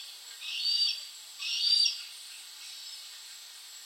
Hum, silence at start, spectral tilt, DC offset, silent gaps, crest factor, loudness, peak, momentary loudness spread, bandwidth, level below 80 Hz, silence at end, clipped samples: none; 0 s; 6 dB/octave; under 0.1%; none; 20 dB; -28 LUFS; -14 dBFS; 20 LU; 16.5 kHz; under -90 dBFS; 0 s; under 0.1%